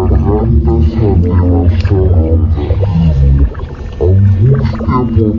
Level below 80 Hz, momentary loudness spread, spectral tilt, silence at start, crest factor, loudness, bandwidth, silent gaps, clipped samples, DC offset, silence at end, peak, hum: -14 dBFS; 4 LU; -10.5 dB/octave; 0 s; 8 dB; -11 LUFS; 5.6 kHz; none; under 0.1%; under 0.1%; 0 s; 0 dBFS; none